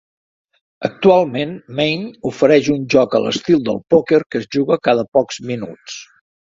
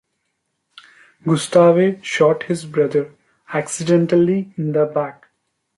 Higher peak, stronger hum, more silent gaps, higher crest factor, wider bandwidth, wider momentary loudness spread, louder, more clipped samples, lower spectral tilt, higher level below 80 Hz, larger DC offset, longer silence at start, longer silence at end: about the same, 0 dBFS vs -2 dBFS; neither; first, 4.26-4.30 s, 5.08-5.12 s vs none; about the same, 16 dB vs 16 dB; second, 7.8 kHz vs 11.5 kHz; about the same, 13 LU vs 12 LU; about the same, -16 LUFS vs -18 LUFS; neither; about the same, -5.5 dB/octave vs -6 dB/octave; first, -56 dBFS vs -64 dBFS; neither; second, 0.8 s vs 1.25 s; about the same, 0.55 s vs 0.65 s